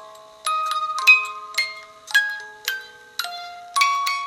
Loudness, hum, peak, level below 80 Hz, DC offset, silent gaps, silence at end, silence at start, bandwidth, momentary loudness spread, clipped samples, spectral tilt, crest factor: -20 LUFS; none; -2 dBFS; -74 dBFS; under 0.1%; none; 0 s; 0 s; 16 kHz; 18 LU; under 0.1%; 3.5 dB/octave; 22 dB